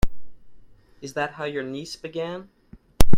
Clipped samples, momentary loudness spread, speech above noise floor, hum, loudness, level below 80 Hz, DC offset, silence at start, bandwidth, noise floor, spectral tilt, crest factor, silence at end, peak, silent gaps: under 0.1%; 11 LU; 17 dB; none; -31 LUFS; -32 dBFS; under 0.1%; 0.05 s; 15 kHz; -47 dBFS; -5 dB/octave; 18 dB; 0 s; 0 dBFS; none